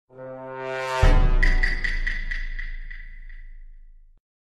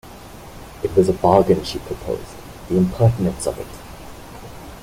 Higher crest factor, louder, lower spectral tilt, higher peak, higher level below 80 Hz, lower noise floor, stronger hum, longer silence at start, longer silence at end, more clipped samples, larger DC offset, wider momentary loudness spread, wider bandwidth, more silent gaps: about the same, 18 dB vs 20 dB; second, -25 LUFS vs -19 LUFS; second, -5.5 dB/octave vs -7 dB/octave; about the same, -4 dBFS vs -2 dBFS; first, -24 dBFS vs -40 dBFS; first, -46 dBFS vs -38 dBFS; neither; about the same, 0.15 s vs 0.05 s; first, 0.55 s vs 0 s; neither; neither; about the same, 21 LU vs 23 LU; second, 7.8 kHz vs 16.5 kHz; neither